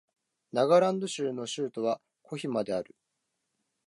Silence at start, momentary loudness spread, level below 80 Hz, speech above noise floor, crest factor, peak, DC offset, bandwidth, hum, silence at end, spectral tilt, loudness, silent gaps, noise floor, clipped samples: 0.55 s; 14 LU; -76 dBFS; 53 dB; 20 dB; -10 dBFS; under 0.1%; 11.5 kHz; none; 1.05 s; -5 dB/octave; -30 LUFS; none; -82 dBFS; under 0.1%